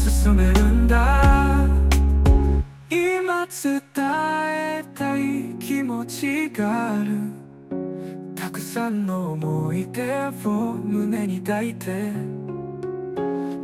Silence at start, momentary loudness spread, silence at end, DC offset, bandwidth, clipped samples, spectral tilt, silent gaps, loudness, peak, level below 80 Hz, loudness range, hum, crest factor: 0 s; 13 LU; 0 s; under 0.1%; 15.5 kHz; under 0.1%; -6.5 dB/octave; none; -23 LUFS; -4 dBFS; -24 dBFS; 8 LU; none; 18 dB